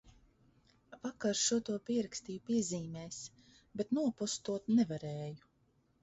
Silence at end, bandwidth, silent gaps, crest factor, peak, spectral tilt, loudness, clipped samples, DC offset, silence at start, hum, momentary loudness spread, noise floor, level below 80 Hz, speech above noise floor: 0.65 s; 8 kHz; none; 18 dB; -20 dBFS; -5.5 dB/octave; -36 LUFS; under 0.1%; under 0.1%; 0.05 s; none; 14 LU; -74 dBFS; -72 dBFS; 38 dB